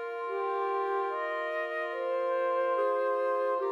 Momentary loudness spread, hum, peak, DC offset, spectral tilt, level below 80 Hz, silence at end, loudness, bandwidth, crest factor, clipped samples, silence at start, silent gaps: 4 LU; none; -20 dBFS; under 0.1%; -2.5 dB/octave; under -90 dBFS; 0 s; -31 LUFS; 6.8 kHz; 12 dB; under 0.1%; 0 s; none